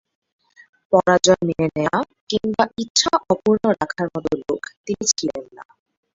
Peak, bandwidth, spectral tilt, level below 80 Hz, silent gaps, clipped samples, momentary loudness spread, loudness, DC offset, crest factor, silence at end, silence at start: -2 dBFS; 8 kHz; -3.5 dB/octave; -54 dBFS; 2.21-2.27 s, 2.90-2.95 s, 4.77-4.84 s; under 0.1%; 10 LU; -20 LUFS; under 0.1%; 20 dB; 0.5 s; 0.9 s